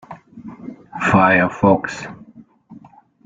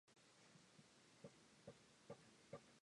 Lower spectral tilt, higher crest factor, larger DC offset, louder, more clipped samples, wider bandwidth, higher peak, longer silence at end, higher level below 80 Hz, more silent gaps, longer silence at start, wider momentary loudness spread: first, -7 dB/octave vs -4.5 dB/octave; about the same, 18 dB vs 22 dB; neither; first, -16 LUFS vs -65 LUFS; neither; second, 7.8 kHz vs 11 kHz; first, -2 dBFS vs -44 dBFS; first, 0.45 s vs 0.05 s; first, -52 dBFS vs under -90 dBFS; neither; about the same, 0.1 s vs 0.05 s; first, 24 LU vs 7 LU